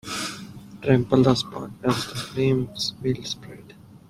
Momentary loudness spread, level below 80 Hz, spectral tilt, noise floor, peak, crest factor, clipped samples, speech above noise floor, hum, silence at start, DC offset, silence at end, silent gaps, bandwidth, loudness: 18 LU; -52 dBFS; -5.5 dB/octave; -47 dBFS; -4 dBFS; 22 dB; under 0.1%; 24 dB; none; 0.05 s; under 0.1%; 0.1 s; none; 15 kHz; -24 LUFS